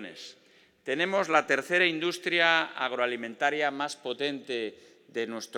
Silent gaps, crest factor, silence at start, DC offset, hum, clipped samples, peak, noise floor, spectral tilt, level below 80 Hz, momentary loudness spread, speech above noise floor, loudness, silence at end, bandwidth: none; 22 dB; 0 s; under 0.1%; none; under 0.1%; -6 dBFS; -61 dBFS; -3 dB/octave; under -90 dBFS; 15 LU; 33 dB; -28 LUFS; 0 s; 16.5 kHz